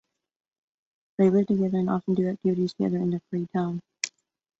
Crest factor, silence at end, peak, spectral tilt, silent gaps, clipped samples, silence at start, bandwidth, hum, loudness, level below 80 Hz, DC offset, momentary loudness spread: 20 dB; 0.5 s; -6 dBFS; -7 dB/octave; none; under 0.1%; 1.2 s; 8 kHz; none; -26 LUFS; -66 dBFS; under 0.1%; 11 LU